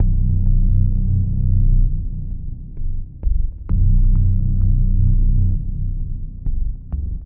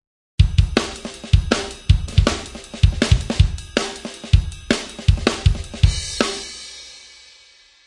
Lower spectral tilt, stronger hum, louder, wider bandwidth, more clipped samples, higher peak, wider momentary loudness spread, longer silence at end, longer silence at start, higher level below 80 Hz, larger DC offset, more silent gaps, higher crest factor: first, -16.5 dB/octave vs -5 dB/octave; neither; about the same, -21 LUFS vs -20 LUFS; second, 0.7 kHz vs 11.5 kHz; neither; second, -4 dBFS vs 0 dBFS; second, 12 LU vs 15 LU; second, 0 s vs 0.85 s; second, 0 s vs 0.4 s; first, -18 dBFS vs -24 dBFS; neither; neither; second, 10 dB vs 20 dB